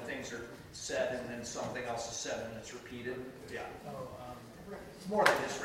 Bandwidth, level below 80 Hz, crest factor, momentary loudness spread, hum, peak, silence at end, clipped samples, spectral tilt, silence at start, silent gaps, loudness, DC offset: 16 kHz; -64 dBFS; 30 dB; 18 LU; none; -8 dBFS; 0 s; under 0.1%; -3 dB/octave; 0 s; none; -37 LUFS; under 0.1%